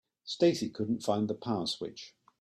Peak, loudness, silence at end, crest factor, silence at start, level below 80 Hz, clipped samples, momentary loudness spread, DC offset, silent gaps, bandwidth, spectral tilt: -14 dBFS; -32 LUFS; 0.3 s; 18 dB; 0.25 s; -70 dBFS; under 0.1%; 14 LU; under 0.1%; none; 13 kHz; -5.5 dB/octave